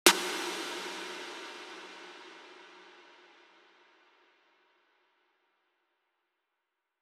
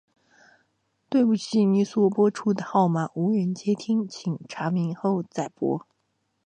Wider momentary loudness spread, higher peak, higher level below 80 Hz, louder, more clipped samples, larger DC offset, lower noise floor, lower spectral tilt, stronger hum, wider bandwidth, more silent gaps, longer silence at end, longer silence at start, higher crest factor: first, 22 LU vs 9 LU; first, -4 dBFS vs -8 dBFS; second, under -90 dBFS vs -74 dBFS; second, -35 LUFS vs -25 LUFS; neither; neither; first, -85 dBFS vs -74 dBFS; second, -0.5 dB/octave vs -7.5 dB/octave; neither; first, over 20 kHz vs 9.6 kHz; neither; first, 3.9 s vs 0.7 s; second, 0.05 s vs 1.1 s; first, 34 dB vs 16 dB